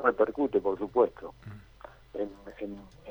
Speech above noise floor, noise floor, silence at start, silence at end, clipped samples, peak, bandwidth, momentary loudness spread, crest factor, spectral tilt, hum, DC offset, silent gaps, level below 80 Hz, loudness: 18 dB; -47 dBFS; 0 s; 0 s; under 0.1%; -10 dBFS; 19.5 kHz; 22 LU; 22 dB; -8 dB/octave; none; under 0.1%; none; -58 dBFS; -30 LUFS